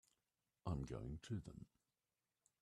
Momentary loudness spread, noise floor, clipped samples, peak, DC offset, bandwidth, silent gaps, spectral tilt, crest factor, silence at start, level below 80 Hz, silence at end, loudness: 14 LU; under -90 dBFS; under 0.1%; -32 dBFS; under 0.1%; 12 kHz; none; -7.5 dB/octave; 20 dB; 0.65 s; -62 dBFS; 1 s; -50 LUFS